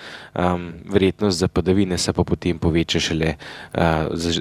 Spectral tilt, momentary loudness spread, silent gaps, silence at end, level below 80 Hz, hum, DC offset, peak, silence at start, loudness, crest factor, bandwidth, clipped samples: -5 dB/octave; 6 LU; none; 0 s; -38 dBFS; none; under 0.1%; -2 dBFS; 0 s; -21 LUFS; 18 dB; 14.5 kHz; under 0.1%